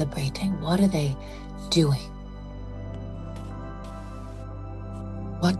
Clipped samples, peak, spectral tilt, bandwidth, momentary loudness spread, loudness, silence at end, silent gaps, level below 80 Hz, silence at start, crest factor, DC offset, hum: under 0.1%; -8 dBFS; -6 dB/octave; 12.5 kHz; 17 LU; -29 LUFS; 0 s; none; -40 dBFS; 0 s; 20 dB; under 0.1%; 50 Hz at -50 dBFS